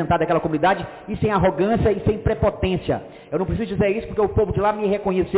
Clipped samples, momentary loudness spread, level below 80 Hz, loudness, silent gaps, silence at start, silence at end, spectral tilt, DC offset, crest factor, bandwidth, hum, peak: under 0.1%; 7 LU; -36 dBFS; -21 LUFS; none; 0 s; 0 s; -11.5 dB/octave; under 0.1%; 10 dB; 4 kHz; none; -10 dBFS